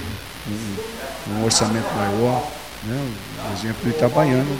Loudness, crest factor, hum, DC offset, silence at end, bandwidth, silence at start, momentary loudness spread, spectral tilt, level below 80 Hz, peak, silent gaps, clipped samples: -22 LUFS; 20 dB; none; 0.4%; 0 s; 16.5 kHz; 0 s; 13 LU; -4.5 dB/octave; -44 dBFS; -2 dBFS; none; under 0.1%